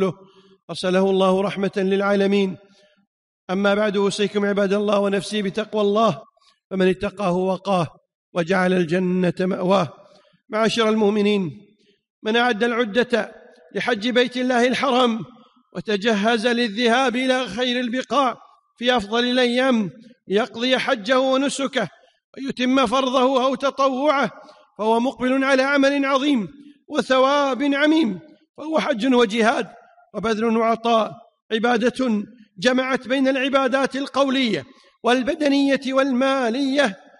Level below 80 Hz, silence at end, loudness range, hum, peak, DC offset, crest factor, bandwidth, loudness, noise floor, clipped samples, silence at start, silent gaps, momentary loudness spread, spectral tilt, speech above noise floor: -60 dBFS; 0.25 s; 2 LU; none; -6 dBFS; under 0.1%; 14 dB; 11.5 kHz; -20 LUFS; -50 dBFS; under 0.1%; 0 s; 0.63-0.68 s, 3.07-3.48 s, 6.65-6.70 s, 8.15-8.32 s, 12.10-12.22 s, 22.24-22.33 s, 28.49-28.54 s, 31.42-31.49 s; 9 LU; -5 dB/octave; 30 dB